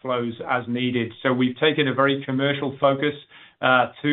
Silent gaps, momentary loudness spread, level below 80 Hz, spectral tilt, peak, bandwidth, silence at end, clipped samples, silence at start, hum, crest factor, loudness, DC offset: none; 6 LU; -68 dBFS; -3.5 dB/octave; -6 dBFS; 4.2 kHz; 0 s; under 0.1%; 0.05 s; none; 18 dB; -22 LUFS; under 0.1%